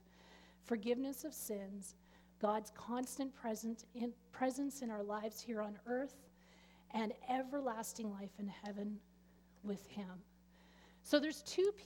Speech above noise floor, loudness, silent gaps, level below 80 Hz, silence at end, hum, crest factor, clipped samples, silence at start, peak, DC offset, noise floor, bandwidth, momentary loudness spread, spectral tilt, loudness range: 25 dB; -43 LUFS; none; -74 dBFS; 0 s; none; 24 dB; under 0.1%; 0.15 s; -18 dBFS; under 0.1%; -67 dBFS; 18.5 kHz; 14 LU; -4.5 dB/octave; 3 LU